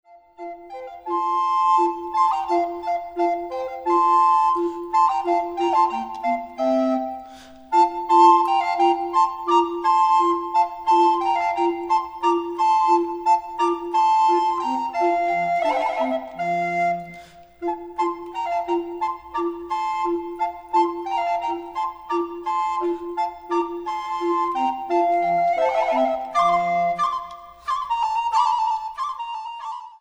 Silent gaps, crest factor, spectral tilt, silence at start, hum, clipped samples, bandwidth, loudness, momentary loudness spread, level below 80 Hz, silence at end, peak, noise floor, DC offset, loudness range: none; 18 dB; -4.5 dB/octave; 0.15 s; none; under 0.1%; over 20 kHz; -21 LUFS; 11 LU; -60 dBFS; 0.05 s; -4 dBFS; -44 dBFS; under 0.1%; 6 LU